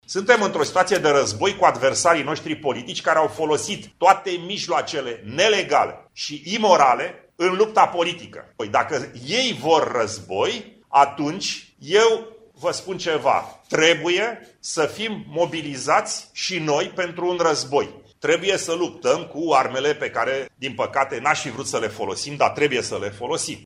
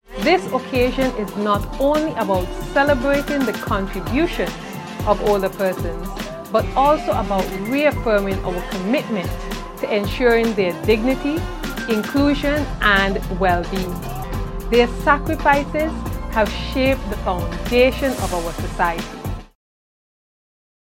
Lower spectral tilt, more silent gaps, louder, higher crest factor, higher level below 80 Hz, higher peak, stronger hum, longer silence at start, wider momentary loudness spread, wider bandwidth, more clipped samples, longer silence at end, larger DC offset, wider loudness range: second, -3 dB/octave vs -5.5 dB/octave; neither; about the same, -21 LUFS vs -20 LUFS; about the same, 22 dB vs 20 dB; second, -62 dBFS vs -30 dBFS; about the same, 0 dBFS vs 0 dBFS; neither; about the same, 0.1 s vs 0.1 s; about the same, 10 LU vs 10 LU; second, 15 kHz vs 17 kHz; neither; second, 0.05 s vs 1.4 s; neither; about the same, 3 LU vs 2 LU